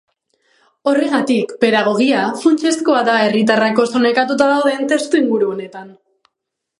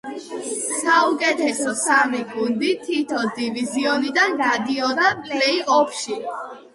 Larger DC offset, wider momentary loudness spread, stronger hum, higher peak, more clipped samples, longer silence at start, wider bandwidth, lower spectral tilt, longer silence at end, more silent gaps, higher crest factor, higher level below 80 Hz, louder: neither; second, 4 LU vs 10 LU; neither; first, 0 dBFS vs -4 dBFS; neither; first, 0.85 s vs 0.05 s; about the same, 11.5 kHz vs 11.5 kHz; first, -4.5 dB/octave vs -2 dB/octave; first, 0.9 s vs 0.15 s; neither; about the same, 16 dB vs 18 dB; about the same, -66 dBFS vs -68 dBFS; first, -15 LUFS vs -20 LUFS